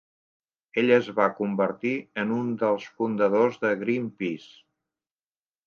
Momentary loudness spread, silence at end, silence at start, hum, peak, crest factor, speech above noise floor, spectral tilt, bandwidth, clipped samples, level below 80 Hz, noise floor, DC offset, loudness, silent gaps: 10 LU; 1.3 s; 0.75 s; none; -6 dBFS; 20 dB; over 65 dB; -7 dB/octave; 6.8 kHz; under 0.1%; -76 dBFS; under -90 dBFS; under 0.1%; -25 LUFS; none